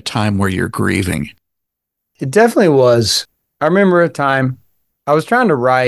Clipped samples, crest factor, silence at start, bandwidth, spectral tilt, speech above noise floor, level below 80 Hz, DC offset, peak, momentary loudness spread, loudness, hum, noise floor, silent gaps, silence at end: under 0.1%; 14 dB; 0.05 s; 12.5 kHz; -5 dB/octave; 64 dB; -40 dBFS; under 0.1%; 0 dBFS; 13 LU; -14 LUFS; none; -77 dBFS; none; 0 s